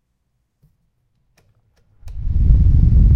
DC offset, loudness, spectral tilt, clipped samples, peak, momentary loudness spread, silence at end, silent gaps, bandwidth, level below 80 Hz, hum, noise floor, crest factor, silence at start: under 0.1%; -16 LUFS; -11 dB/octave; under 0.1%; 0 dBFS; 18 LU; 0 s; none; 1.2 kHz; -18 dBFS; none; -69 dBFS; 16 dB; 2.05 s